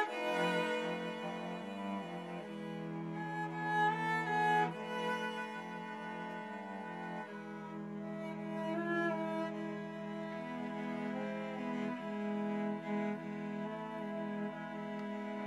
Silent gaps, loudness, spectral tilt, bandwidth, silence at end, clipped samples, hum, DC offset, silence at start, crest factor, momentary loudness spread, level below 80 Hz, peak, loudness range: none; -39 LUFS; -6 dB/octave; 13 kHz; 0 s; under 0.1%; none; under 0.1%; 0 s; 18 dB; 11 LU; under -90 dBFS; -22 dBFS; 6 LU